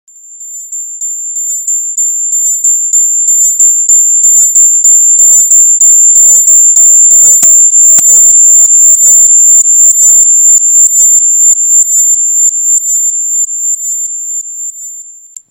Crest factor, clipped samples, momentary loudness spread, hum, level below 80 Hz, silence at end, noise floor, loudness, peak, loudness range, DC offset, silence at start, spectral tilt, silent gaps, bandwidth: 6 dB; 5%; 14 LU; none; -56 dBFS; 0.4 s; -30 dBFS; -2 LUFS; 0 dBFS; 7 LU; under 0.1%; 0.3 s; 2.5 dB/octave; none; over 20 kHz